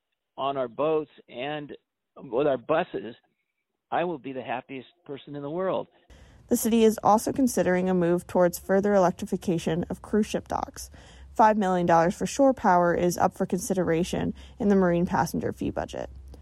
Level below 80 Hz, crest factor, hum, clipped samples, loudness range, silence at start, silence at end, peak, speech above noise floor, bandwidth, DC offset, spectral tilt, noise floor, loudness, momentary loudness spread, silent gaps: -52 dBFS; 18 dB; none; under 0.1%; 8 LU; 0.4 s; 0.05 s; -8 dBFS; 56 dB; 16 kHz; under 0.1%; -6 dB/octave; -81 dBFS; -25 LUFS; 15 LU; none